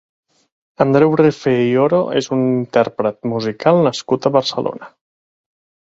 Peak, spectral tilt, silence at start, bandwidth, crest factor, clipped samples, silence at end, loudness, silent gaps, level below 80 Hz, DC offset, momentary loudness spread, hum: 0 dBFS; -6.5 dB/octave; 0.8 s; 7.8 kHz; 16 dB; under 0.1%; 0.95 s; -16 LUFS; none; -58 dBFS; under 0.1%; 8 LU; none